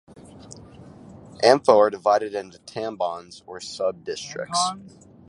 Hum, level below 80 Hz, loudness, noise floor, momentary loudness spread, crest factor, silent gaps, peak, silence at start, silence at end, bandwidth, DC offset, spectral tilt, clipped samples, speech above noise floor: none; -62 dBFS; -22 LUFS; -45 dBFS; 23 LU; 24 dB; none; 0 dBFS; 0.35 s; 0.4 s; 11.5 kHz; under 0.1%; -3.5 dB/octave; under 0.1%; 22 dB